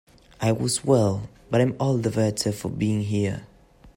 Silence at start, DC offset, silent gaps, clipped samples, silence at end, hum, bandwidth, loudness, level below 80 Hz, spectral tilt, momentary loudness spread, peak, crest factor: 0.4 s; under 0.1%; none; under 0.1%; 0.05 s; none; 16 kHz; -24 LUFS; -54 dBFS; -6 dB/octave; 7 LU; -6 dBFS; 18 dB